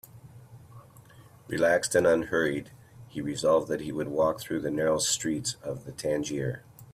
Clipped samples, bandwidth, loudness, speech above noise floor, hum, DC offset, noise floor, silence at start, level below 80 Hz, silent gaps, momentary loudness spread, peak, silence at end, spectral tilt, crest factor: under 0.1%; 16 kHz; -28 LUFS; 25 dB; none; under 0.1%; -53 dBFS; 0.15 s; -60 dBFS; none; 13 LU; -10 dBFS; 0 s; -4 dB/octave; 18 dB